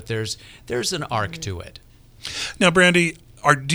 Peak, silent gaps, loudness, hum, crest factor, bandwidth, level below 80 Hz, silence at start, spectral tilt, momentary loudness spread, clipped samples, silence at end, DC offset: 0 dBFS; none; -21 LUFS; none; 22 dB; over 20 kHz; -48 dBFS; 0 s; -4 dB/octave; 18 LU; under 0.1%; 0 s; under 0.1%